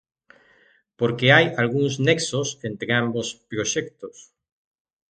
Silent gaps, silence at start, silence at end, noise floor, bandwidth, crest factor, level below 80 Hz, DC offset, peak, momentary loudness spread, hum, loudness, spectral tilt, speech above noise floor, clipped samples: none; 1 s; 0.9 s; -59 dBFS; 9.4 kHz; 22 dB; -62 dBFS; under 0.1%; 0 dBFS; 14 LU; none; -21 LUFS; -4 dB/octave; 37 dB; under 0.1%